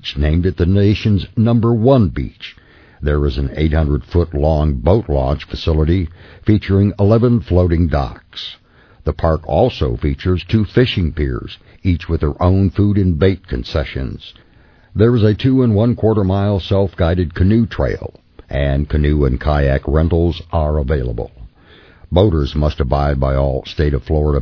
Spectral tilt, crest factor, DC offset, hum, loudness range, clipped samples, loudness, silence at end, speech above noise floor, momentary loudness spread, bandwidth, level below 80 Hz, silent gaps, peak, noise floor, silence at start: -9.5 dB/octave; 16 dB; under 0.1%; none; 2 LU; under 0.1%; -16 LUFS; 0 s; 30 dB; 11 LU; 5.4 kHz; -24 dBFS; none; 0 dBFS; -45 dBFS; 0.05 s